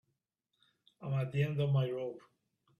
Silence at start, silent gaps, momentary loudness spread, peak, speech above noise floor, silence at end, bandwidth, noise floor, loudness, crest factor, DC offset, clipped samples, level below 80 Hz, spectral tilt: 1 s; none; 14 LU; -20 dBFS; 51 dB; 0.6 s; 4.7 kHz; -84 dBFS; -35 LUFS; 16 dB; under 0.1%; under 0.1%; -72 dBFS; -8.5 dB/octave